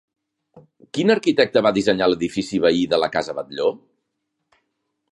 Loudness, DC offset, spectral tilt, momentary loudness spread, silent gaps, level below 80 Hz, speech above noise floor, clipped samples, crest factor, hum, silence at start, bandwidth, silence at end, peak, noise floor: -20 LUFS; under 0.1%; -5 dB/octave; 8 LU; none; -58 dBFS; 57 dB; under 0.1%; 22 dB; none; 0.95 s; 11.5 kHz; 1.35 s; 0 dBFS; -77 dBFS